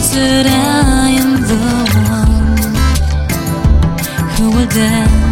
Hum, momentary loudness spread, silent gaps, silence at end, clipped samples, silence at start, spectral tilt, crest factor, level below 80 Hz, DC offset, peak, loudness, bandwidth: none; 5 LU; none; 0 s; under 0.1%; 0 s; -5 dB/octave; 10 dB; -16 dBFS; 0.3%; 0 dBFS; -12 LUFS; 17 kHz